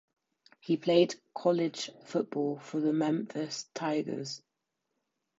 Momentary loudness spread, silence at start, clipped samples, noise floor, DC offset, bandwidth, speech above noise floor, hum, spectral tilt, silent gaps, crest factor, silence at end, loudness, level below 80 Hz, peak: 12 LU; 0.65 s; under 0.1%; -84 dBFS; under 0.1%; 8 kHz; 54 dB; none; -5.5 dB/octave; none; 22 dB; 1 s; -32 LUFS; -84 dBFS; -12 dBFS